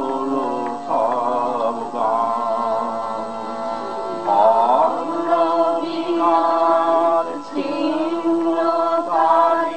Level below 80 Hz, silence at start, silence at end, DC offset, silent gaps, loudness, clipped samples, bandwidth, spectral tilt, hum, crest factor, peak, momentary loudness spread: -66 dBFS; 0 s; 0 s; 0.9%; none; -19 LUFS; under 0.1%; 8.8 kHz; -5.5 dB/octave; none; 16 dB; -4 dBFS; 10 LU